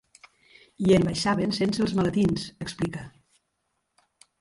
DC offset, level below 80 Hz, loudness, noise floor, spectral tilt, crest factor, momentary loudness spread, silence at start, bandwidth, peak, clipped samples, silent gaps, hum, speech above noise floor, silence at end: under 0.1%; -52 dBFS; -25 LUFS; -77 dBFS; -6 dB/octave; 18 dB; 12 LU; 0.8 s; 11.5 kHz; -8 dBFS; under 0.1%; none; none; 53 dB; 1.3 s